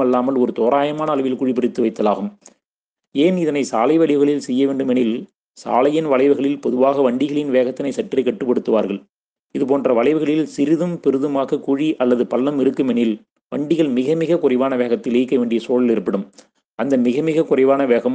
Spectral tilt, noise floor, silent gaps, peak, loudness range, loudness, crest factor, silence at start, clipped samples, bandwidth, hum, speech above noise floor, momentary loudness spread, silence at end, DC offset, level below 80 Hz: -7 dB/octave; -83 dBFS; 9.09-9.13 s, 9.39-9.43 s, 16.74-16.78 s; -2 dBFS; 2 LU; -18 LUFS; 16 dB; 0 s; under 0.1%; 9.2 kHz; none; 66 dB; 7 LU; 0 s; under 0.1%; -66 dBFS